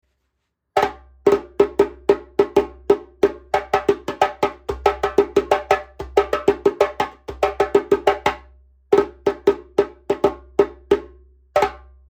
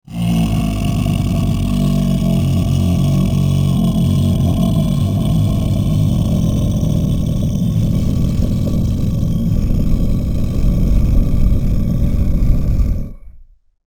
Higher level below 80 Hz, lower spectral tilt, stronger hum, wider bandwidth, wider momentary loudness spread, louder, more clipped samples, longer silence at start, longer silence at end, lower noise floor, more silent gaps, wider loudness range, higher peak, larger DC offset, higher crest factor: second, -44 dBFS vs -20 dBFS; second, -5.5 dB/octave vs -8 dB/octave; neither; second, 14.5 kHz vs 19.5 kHz; first, 6 LU vs 3 LU; second, -20 LUFS vs -16 LUFS; neither; first, 0.75 s vs 0.1 s; about the same, 0.35 s vs 0.45 s; first, -74 dBFS vs -40 dBFS; neither; about the same, 1 LU vs 2 LU; about the same, 0 dBFS vs 0 dBFS; neither; first, 20 dB vs 14 dB